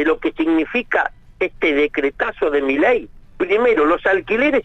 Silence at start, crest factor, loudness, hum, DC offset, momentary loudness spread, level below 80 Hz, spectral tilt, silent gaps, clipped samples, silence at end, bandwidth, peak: 0 s; 12 dB; -18 LUFS; none; under 0.1%; 6 LU; -44 dBFS; -5.5 dB/octave; none; under 0.1%; 0 s; 8 kHz; -6 dBFS